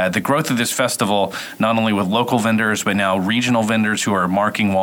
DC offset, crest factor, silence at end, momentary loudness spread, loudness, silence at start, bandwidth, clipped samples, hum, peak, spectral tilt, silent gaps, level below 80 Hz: under 0.1%; 14 dB; 0 s; 2 LU; -18 LUFS; 0 s; over 20 kHz; under 0.1%; none; -2 dBFS; -4.5 dB/octave; none; -62 dBFS